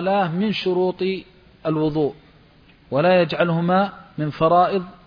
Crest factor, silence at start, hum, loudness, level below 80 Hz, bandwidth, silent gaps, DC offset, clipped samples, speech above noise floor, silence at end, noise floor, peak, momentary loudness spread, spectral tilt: 16 dB; 0 s; none; -21 LUFS; -54 dBFS; 5.2 kHz; none; under 0.1%; under 0.1%; 32 dB; 0.1 s; -51 dBFS; -4 dBFS; 9 LU; -8.5 dB/octave